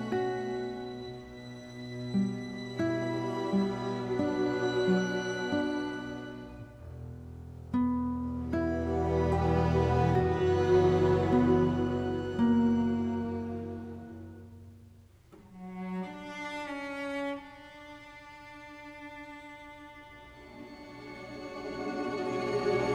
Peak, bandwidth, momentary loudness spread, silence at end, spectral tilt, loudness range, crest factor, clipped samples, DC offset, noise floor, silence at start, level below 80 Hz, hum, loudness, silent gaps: -14 dBFS; 10.5 kHz; 21 LU; 0 s; -7.5 dB/octave; 15 LU; 18 dB; under 0.1%; under 0.1%; -56 dBFS; 0 s; -50 dBFS; none; -31 LUFS; none